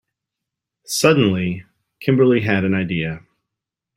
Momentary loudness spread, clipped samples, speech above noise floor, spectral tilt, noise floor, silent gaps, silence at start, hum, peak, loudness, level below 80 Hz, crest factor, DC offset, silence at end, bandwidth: 12 LU; under 0.1%; 67 dB; -5.5 dB/octave; -84 dBFS; none; 0.9 s; none; 0 dBFS; -18 LUFS; -56 dBFS; 20 dB; under 0.1%; 0.8 s; 16 kHz